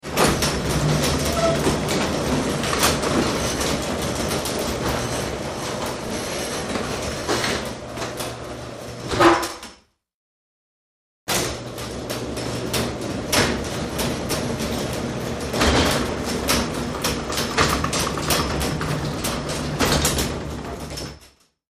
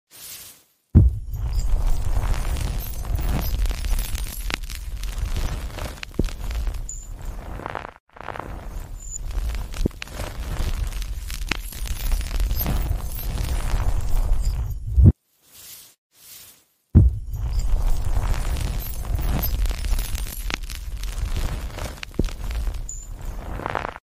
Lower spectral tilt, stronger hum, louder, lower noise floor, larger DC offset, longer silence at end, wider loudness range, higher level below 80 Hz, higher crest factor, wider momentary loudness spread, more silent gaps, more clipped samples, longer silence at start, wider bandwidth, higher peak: second, -4 dB/octave vs -5.5 dB/octave; neither; first, -23 LUFS vs -27 LUFS; about the same, -53 dBFS vs -53 dBFS; second, under 0.1% vs 0.3%; first, 0.45 s vs 0.05 s; second, 5 LU vs 9 LU; second, -36 dBFS vs -24 dBFS; about the same, 22 dB vs 22 dB; second, 11 LU vs 15 LU; first, 10.14-11.26 s vs 8.00-8.07 s, 15.98-16.10 s; neither; about the same, 0.05 s vs 0.15 s; about the same, 15.5 kHz vs 16 kHz; about the same, -2 dBFS vs 0 dBFS